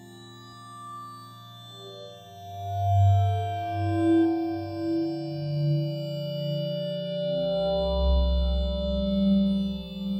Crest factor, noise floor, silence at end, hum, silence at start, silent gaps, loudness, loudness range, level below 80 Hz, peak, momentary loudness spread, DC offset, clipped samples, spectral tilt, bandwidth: 14 dB; -46 dBFS; 0 s; none; 0 s; none; -27 LUFS; 3 LU; -34 dBFS; -12 dBFS; 21 LU; under 0.1%; under 0.1%; -8.5 dB/octave; 14.5 kHz